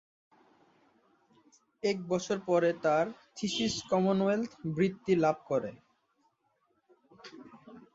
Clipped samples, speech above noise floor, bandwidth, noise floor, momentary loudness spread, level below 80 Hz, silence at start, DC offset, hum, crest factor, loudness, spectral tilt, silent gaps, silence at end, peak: under 0.1%; 45 dB; 8 kHz; -75 dBFS; 18 LU; -70 dBFS; 1.85 s; under 0.1%; none; 18 dB; -31 LUFS; -5.5 dB/octave; none; 0.15 s; -14 dBFS